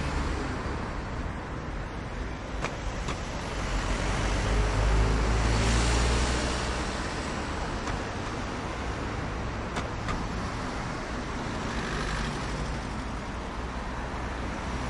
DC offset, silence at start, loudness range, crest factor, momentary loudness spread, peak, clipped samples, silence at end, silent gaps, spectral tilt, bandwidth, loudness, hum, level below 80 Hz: under 0.1%; 0 s; 6 LU; 18 dB; 9 LU; -12 dBFS; under 0.1%; 0 s; none; -5 dB/octave; 11.5 kHz; -31 LUFS; none; -34 dBFS